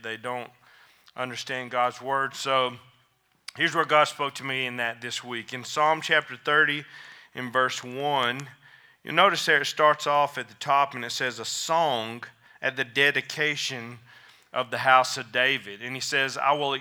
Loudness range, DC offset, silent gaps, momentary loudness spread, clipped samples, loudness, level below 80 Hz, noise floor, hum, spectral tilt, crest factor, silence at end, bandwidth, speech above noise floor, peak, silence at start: 3 LU; under 0.1%; none; 15 LU; under 0.1%; -25 LUFS; -82 dBFS; -67 dBFS; none; -2.5 dB/octave; 24 dB; 0 s; over 20 kHz; 41 dB; -2 dBFS; 0.05 s